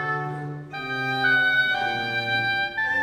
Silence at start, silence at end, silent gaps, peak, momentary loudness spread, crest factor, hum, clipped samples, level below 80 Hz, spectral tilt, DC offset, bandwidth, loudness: 0 s; 0 s; none; -10 dBFS; 13 LU; 14 dB; none; under 0.1%; -60 dBFS; -4.5 dB/octave; under 0.1%; 16 kHz; -23 LUFS